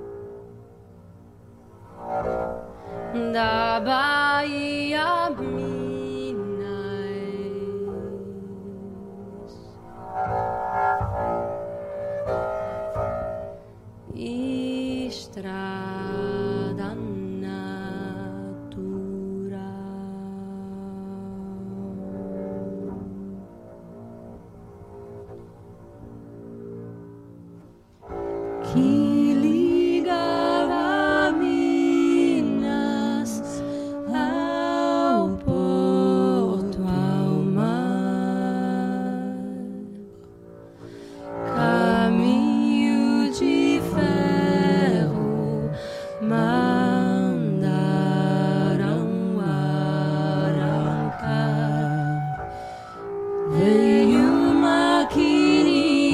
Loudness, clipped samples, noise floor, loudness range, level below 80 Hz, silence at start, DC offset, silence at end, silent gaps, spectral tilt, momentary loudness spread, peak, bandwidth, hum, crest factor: -23 LUFS; under 0.1%; -48 dBFS; 14 LU; -50 dBFS; 0 s; under 0.1%; 0 s; none; -7 dB/octave; 19 LU; -6 dBFS; 13 kHz; none; 16 dB